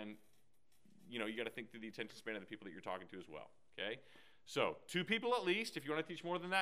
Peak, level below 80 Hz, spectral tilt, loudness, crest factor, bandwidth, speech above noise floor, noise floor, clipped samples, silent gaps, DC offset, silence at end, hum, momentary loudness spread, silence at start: -20 dBFS; -86 dBFS; -4 dB/octave; -42 LUFS; 24 dB; 15.5 kHz; 36 dB; -79 dBFS; under 0.1%; none; under 0.1%; 0 s; none; 16 LU; 0 s